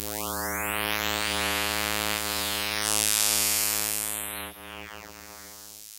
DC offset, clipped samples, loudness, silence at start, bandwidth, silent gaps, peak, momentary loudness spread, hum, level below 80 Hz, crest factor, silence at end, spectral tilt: under 0.1%; under 0.1%; -25 LUFS; 0 s; 17 kHz; none; 0 dBFS; 21 LU; none; -50 dBFS; 30 dB; 0 s; -0.5 dB/octave